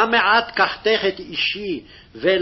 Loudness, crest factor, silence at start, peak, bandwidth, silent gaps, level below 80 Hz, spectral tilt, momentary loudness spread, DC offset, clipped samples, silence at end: -19 LUFS; 16 dB; 0 s; -4 dBFS; 6 kHz; none; -52 dBFS; -4.5 dB/octave; 11 LU; under 0.1%; under 0.1%; 0 s